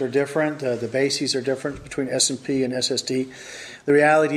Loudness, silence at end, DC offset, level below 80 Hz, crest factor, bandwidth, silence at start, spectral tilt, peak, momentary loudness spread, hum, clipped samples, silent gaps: -22 LUFS; 0 s; under 0.1%; -58 dBFS; 16 dB; 14 kHz; 0 s; -3.5 dB/octave; -6 dBFS; 12 LU; none; under 0.1%; none